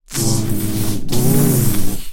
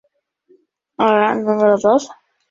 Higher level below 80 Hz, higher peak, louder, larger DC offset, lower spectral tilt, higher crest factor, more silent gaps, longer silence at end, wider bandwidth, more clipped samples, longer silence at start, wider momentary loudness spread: first, -28 dBFS vs -62 dBFS; about the same, -2 dBFS vs 0 dBFS; about the same, -17 LUFS vs -15 LUFS; neither; about the same, -5 dB/octave vs -5.5 dB/octave; about the same, 12 dB vs 16 dB; neither; second, 0 s vs 0.4 s; first, 17 kHz vs 7.6 kHz; neither; second, 0.1 s vs 1 s; about the same, 7 LU vs 5 LU